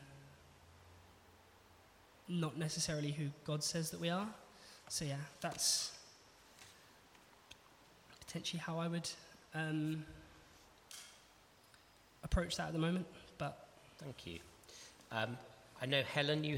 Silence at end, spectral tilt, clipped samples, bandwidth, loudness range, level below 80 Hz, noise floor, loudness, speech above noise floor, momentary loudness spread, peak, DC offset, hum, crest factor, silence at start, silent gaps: 0 s; -4 dB/octave; under 0.1%; 16.5 kHz; 6 LU; -58 dBFS; -66 dBFS; -40 LUFS; 26 dB; 24 LU; -20 dBFS; under 0.1%; none; 24 dB; 0 s; none